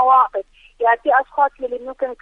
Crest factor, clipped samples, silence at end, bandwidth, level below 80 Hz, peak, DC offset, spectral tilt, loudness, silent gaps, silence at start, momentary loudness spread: 14 dB; under 0.1%; 0.05 s; 4 kHz; -54 dBFS; -4 dBFS; under 0.1%; -4.5 dB/octave; -18 LUFS; none; 0 s; 12 LU